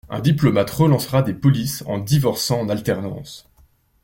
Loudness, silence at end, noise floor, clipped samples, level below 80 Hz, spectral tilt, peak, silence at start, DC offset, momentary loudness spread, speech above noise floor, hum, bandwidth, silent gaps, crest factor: -19 LUFS; 0.65 s; -56 dBFS; under 0.1%; -48 dBFS; -6 dB/octave; -2 dBFS; 0.05 s; under 0.1%; 9 LU; 37 dB; none; 17 kHz; none; 16 dB